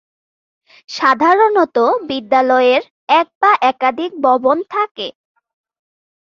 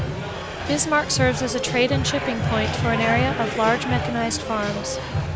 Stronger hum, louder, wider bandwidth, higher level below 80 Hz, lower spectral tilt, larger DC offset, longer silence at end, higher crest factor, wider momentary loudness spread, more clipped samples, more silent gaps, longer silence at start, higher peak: neither; first, -14 LUFS vs -22 LUFS; about the same, 7.4 kHz vs 8 kHz; second, -66 dBFS vs -38 dBFS; about the same, -3.5 dB/octave vs -4.5 dB/octave; neither; first, 1.3 s vs 0 s; about the same, 14 dB vs 16 dB; about the same, 8 LU vs 7 LU; neither; first, 2.90-3.07 s, 3.35-3.41 s, 4.91-4.95 s vs none; first, 0.9 s vs 0 s; first, -2 dBFS vs -6 dBFS